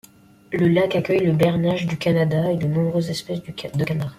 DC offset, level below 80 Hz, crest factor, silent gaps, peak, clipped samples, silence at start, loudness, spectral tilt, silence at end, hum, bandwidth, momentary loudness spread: under 0.1%; -54 dBFS; 16 dB; none; -4 dBFS; under 0.1%; 0.5 s; -21 LUFS; -7 dB/octave; 0.05 s; none; 14.5 kHz; 10 LU